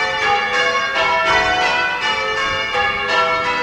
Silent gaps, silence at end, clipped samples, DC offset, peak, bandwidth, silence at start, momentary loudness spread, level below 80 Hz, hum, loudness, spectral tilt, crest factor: none; 0 s; under 0.1%; under 0.1%; -2 dBFS; 16 kHz; 0 s; 3 LU; -44 dBFS; none; -16 LUFS; -2 dB/octave; 14 dB